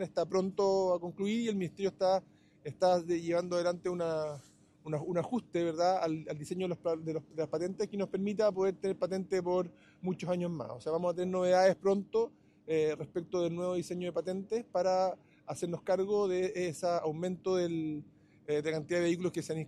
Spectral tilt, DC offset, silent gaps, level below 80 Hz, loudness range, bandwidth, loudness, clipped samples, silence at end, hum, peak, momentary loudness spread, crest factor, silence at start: -6 dB/octave; under 0.1%; none; -72 dBFS; 3 LU; 12.5 kHz; -33 LUFS; under 0.1%; 0 s; none; -14 dBFS; 9 LU; 18 dB; 0 s